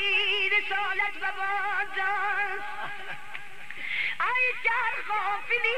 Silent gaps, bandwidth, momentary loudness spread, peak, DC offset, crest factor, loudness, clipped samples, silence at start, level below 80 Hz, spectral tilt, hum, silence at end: none; 13.5 kHz; 14 LU; -14 dBFS; 2%; 16 dB; -27 LUFS; under 0.1%; 0 s; -72 dBFS; -1.5 dB/octave; none; 0 s